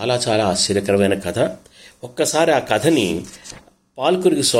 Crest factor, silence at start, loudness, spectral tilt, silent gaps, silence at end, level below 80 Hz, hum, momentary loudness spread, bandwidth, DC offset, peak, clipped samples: 18 dB; 0 s; -18 LUFS; -4 dB/octave; none; 0 s; -54 dBFS; none; 19 LU; 16.5 kHz; under 0.1%; -2 dBFS; under 0.1%